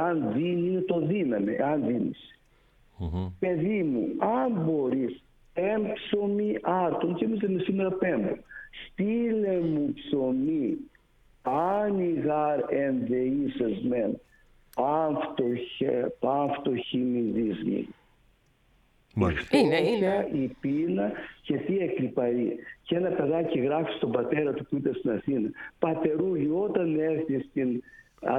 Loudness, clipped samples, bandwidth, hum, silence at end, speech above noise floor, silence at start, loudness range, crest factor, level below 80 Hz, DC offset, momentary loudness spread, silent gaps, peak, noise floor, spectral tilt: -28 LUFS; under 0.1%; 11.5 kHz; none; 0 s; 37 dB; 0 s; 2 LU; 20 dB; -56 dBFS; under 0.1%; 6 LU; none; -8 dBFS; -64 dBFS; -8 dB/octave